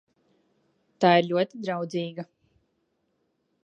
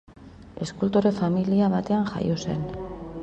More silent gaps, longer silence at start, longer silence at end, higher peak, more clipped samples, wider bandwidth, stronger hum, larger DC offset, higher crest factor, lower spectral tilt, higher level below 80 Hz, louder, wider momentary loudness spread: neither; first, 1 s vs 0.2 s; first, 1.4 s vs 0 s; about the same, -6 dBFS vs -8 dBFS; neither; about the same, 8.2 kHz vs 8.2 kHz; neither; neither; first, 24 dB vs 16 dB; about the same, -6.5 dB/octave vs -7.5 dB/octave; second, -78 dBFS vs -48 dBFS; about the same, -25 LUFS vs -25 LUFS; first, 18 LU vs 13 LU